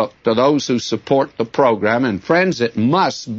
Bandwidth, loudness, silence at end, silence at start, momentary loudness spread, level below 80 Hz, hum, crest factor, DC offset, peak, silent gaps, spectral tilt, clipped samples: 7.8 kHz; -17 LUFS; 0 s; 0 s; 4 LU; -58 dBFS; none; 14 dB; under 0.1%; -2 dBFS; none; -5.5 dB/octave; under 0.1%